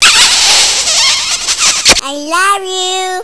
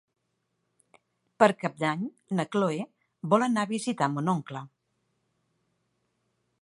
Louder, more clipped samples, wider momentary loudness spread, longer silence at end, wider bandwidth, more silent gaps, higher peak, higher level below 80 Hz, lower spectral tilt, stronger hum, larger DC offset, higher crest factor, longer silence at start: first, -7 LUFS vs -27 LUFS; first, 1% vs under 0.1%; second, 9 LU vs 15 LU; second, 0 s vs 1.95 s; about the same, 11 kHz vs 11.5 kHz; neither; first, 0 dBFS vs -4 dBFS; first, -38 dBFS vs -80 dBFS; second, 1 dB/octave vs -6 dB/octave; neither; neither; second, 10 dB vs 26 dB; second, 0 s vs 1.4 s